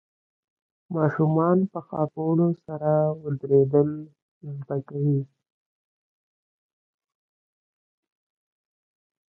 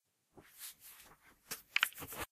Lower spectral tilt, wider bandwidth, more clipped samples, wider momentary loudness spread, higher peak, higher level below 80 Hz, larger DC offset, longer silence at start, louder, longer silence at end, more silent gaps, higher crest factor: first, -13 dB/octave vs 0 dB/octave; second, 2.3 kHz vs 15.5 kHz; neither; second, 15 LU vs 24 LU; about the same, -8 dBFS vs -10 dBFS; about the same, -68 dBFS vs -70 dBFS; neither; first, 0.9 s vs 0.35 s; first, -24 LUFS vs -39 LUFS; first, 4.1 s vs 0.05 s; first, 4.22-4.41 s vs none; second, 20 dB vs 34 dB